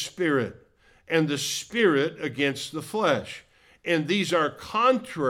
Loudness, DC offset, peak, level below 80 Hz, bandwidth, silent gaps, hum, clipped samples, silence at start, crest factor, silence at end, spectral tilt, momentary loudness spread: -25 LUFS; under 0.1%; -10 dBFS; -64 dBFS; 17 kHz; none; none; under 0.1%; 0 s; 16 dB; 0 s; -4 dB/octave; 10 LU